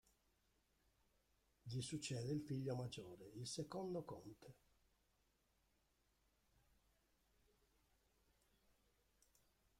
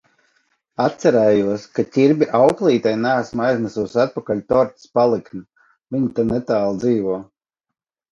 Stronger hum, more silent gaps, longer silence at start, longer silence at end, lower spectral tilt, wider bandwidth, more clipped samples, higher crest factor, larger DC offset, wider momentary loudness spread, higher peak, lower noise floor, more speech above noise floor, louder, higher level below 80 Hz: neither; neither; first, 1.65 s vs 0.8 s; first, 5.25 s vs 0.9 s; second, -5.5 dB/octave vs -7 dB/octave; first, 16 kHz vs 10.5 kHz; neither; about the same, 18 dB vs 18 dB; neither; first, 15 LU vs 10 LU; second, -34 dBFS vs -2 dBFS; first, -83 dBFS vs -65 dBFS; second, 34 dB vs 47 dB; second, -49 LUFS vs -18 LUFS; second, -80 dBFS vs -54 dBFS